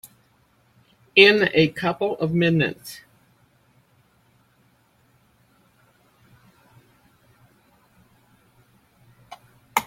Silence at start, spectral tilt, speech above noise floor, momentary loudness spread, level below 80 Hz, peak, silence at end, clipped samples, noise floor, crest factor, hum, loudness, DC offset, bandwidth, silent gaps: 1.15 s; -5 dB/octave; 42 dB; 22 LU; -62 dBFS; -2 dBFS; 0 s; under 0.1%; -61 dBFS; 26 dB; none; -19 LUFS; under 0.1%; 16.5 kHz; none